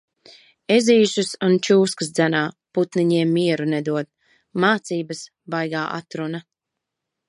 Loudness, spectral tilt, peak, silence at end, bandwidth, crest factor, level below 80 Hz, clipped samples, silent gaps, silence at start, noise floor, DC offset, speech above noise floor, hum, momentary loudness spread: -20 LUFS; -5 dB/octave; -4 dBFS; 0.9 s; 11.5 kHz; 18 dB; -72 dBFS; under 0.1%; none; 0.7 s; -83 dBFS; under 0.1%; 63 dB; none; 14 LU